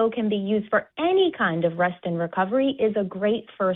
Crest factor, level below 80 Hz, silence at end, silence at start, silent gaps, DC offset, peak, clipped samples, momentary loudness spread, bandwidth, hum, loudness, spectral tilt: 14 dB; -64 dBFS; 0 s; 0 s; none; under 0.1%; -10 dBFS; under 0.1%; 5 LU; 4.1 kHz; none; -24 LUFS; -10 dB/octave